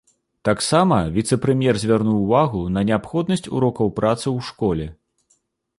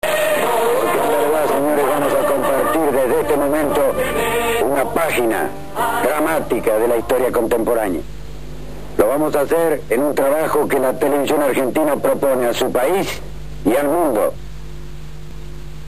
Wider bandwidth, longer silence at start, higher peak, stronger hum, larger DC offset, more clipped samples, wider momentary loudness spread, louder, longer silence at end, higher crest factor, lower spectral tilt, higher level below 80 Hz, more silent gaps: second, 11.5 kHz vs 15 kHz; first, 0.45 s vs 0 s; about the same, -2 dBFS vs 0 dBFS; second, none vs 50 Hz at -40 dBFS; second, under 0.1% vs 4%; neither; second, 6 LU vs 18 LU; second, -20 LUFS vs -17 LUFS; first, 0.85 s vs 0 s; about the same, 18 dB vs 18 dB; first, -6 dB/octave vs -4.5 dB/octave; second, -44 dBFS vs -38 dBFS; neither